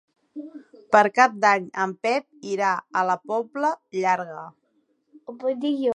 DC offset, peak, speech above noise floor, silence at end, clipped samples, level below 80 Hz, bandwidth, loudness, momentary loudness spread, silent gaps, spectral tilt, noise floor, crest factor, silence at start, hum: under 0.1%; -2 dBFS; 46 dB; 0.05 s; under 0.1%; -76 dBFS; 10.5 kHz; -23 LUFS; 21 LU; none; -4.5 dB/octave; -68 dBFS; 22 dB; 0.35 s; none